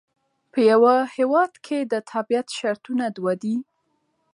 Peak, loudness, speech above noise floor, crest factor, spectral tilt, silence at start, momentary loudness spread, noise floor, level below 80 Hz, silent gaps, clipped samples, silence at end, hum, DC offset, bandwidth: -6 dBFS; -22 LUFS; 50 dB; 16 dB; -5.5 dB/octave; 0.55 s; 11 LU; -71 dBFS; -78 dBFS; none; under 0.1%; 0.7 s; none; under 0.1%; 11.5 kHz